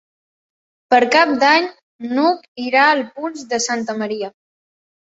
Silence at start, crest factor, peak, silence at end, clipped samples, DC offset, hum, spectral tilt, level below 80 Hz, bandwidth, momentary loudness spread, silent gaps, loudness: 0.9 s; 18 dB; 0 dBFS; 0.85 s; under 0.1%; under 0.1%; none; -2.5 dB/octave; -66 dBFS; 8.2 kHz; 14 LU; 1.83-1.99 s, 2.48-2.55 s; -16 LUFS